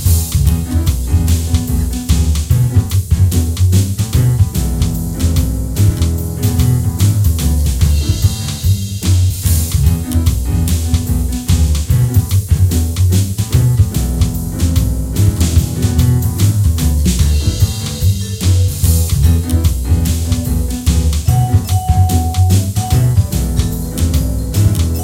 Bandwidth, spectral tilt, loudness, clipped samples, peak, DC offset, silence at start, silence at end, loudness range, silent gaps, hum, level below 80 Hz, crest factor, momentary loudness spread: 17 kHz; -5.5 dB/octave; -14 LUFS; under 0.1%; 0 dBFS; under 0.1%; 0 s; 0 s; 1 LU; none; none; -18 dBFS; 12 dB; 4 LU